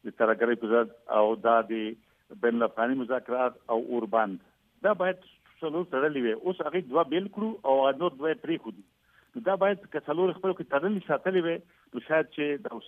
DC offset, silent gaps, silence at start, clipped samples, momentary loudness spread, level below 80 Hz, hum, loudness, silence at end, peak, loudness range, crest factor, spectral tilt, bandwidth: under 0.1%; none; 0.05 s; under 0.1%; 9 LU; -76 dBFS; none; -28 LUFS; 0 s; -10 dBFS; 2 LU; 18 dB; -8 dB/octave; 3.9 kHz